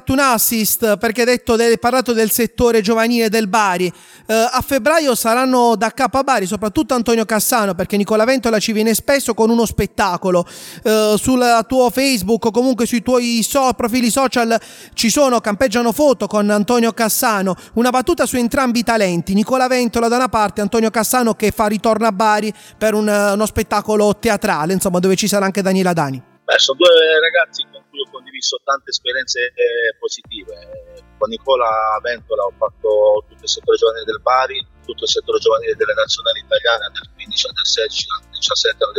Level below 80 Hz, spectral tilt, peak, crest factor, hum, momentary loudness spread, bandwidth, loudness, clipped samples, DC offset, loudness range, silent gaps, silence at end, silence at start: -44 dBFS; -3.5 dB/octave; -2 dBFS; 14 dB; none; 7 LU; 18 kHz; -15 LUFS; under 0.1%; under 0.1%; 3 LU; none; 0 s; 0.05 s